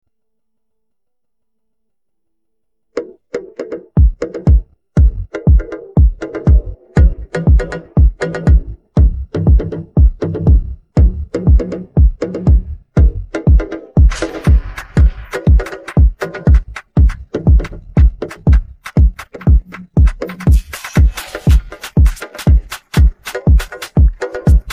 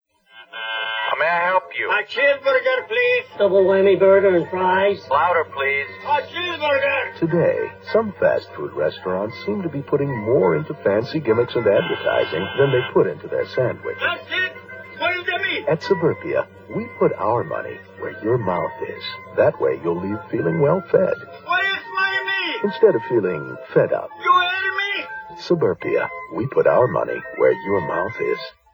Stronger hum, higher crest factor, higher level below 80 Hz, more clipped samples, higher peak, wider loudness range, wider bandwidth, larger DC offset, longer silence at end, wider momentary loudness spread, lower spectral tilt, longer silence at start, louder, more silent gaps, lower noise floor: neither; second, 12 dB vs 18 dB; first, -14 dBFS vs -62 dBFS; neither; about the same, 0 dBFS vs -2 dBFS; about the same, 3 LU vs 5 LU; second, 11.5 kHz vs over 20 kHz; neither; second, 0 s vs 0.25 s; second, 5 LU vs 9 LU; about the same, -8 dB/octave vs -7 dB/octave; first, 2.95 s vs 0.35 s; first, -15 LUFS vs -20 LUFS; neither; first, -80 dBFS vs -48 dBFS